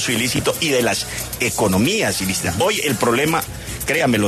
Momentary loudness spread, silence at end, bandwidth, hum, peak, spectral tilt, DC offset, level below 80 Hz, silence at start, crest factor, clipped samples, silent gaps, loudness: 5 LU; 0 s; 14 kHz; none; -6 dBFS; -3.5 dB/octave; under 0.1%; -42 dBFS; 0 s; 14 dB; under 0.1%; none; -18 LUFS